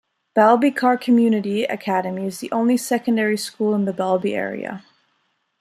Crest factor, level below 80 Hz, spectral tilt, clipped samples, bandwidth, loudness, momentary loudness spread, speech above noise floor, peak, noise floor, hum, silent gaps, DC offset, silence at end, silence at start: 18 dB; -70 dBFS; -5.5 dB/octave; under 0.1%; 14 kHz; -20 LUFS; 11 LU; 49 dB; -2 dBFS; -69 dBFS; none; none; under 0.1%; 0.8 s; 0.35 s